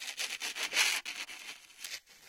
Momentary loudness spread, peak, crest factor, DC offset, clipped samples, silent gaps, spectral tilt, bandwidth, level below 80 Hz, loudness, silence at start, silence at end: 17 LU; -14 dBFS; 24 dB; under 0.1%; under 0.1%; none; 3 dB/octave; 17 kHz; -80 dBFS; -33 LUFS; 0 s; 0 s